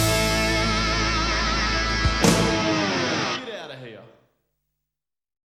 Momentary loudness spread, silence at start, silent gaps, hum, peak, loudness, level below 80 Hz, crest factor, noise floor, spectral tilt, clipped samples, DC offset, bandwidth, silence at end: 16 LU; 0 s; none; none; -2 dBFS; -21 LUFS; -32 dBFS; 22 dB; -87 dBFS; -3.5 dB/octave; under 0.1%; under 0.1%; 16.5 kHz; 1.45 s